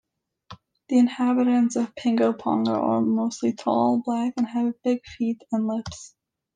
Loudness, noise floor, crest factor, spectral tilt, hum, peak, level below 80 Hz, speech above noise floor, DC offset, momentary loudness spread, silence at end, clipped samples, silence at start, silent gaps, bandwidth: -24 LUFS; -50 dBFS; 14 dB; -6 dB/octave; none; -8 dBFS; -62 dBFS; 27 dB; under 0.1%; 7 LU; 0.5 s; under 0.1%; 0.5 s; none; 9.4 kHz